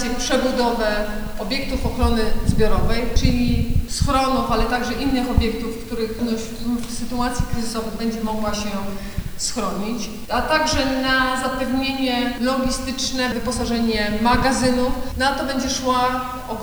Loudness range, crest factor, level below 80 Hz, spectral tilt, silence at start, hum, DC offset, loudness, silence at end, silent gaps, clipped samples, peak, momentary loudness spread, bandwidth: 5 LU; 20 dB; -28 dBFS; -4.5 dB/octave; 0 s; none; under 0.1%; -21 LUFS; 0 s; none; under 0.1%; 0 dBFS; 8 LU; over 20 kHz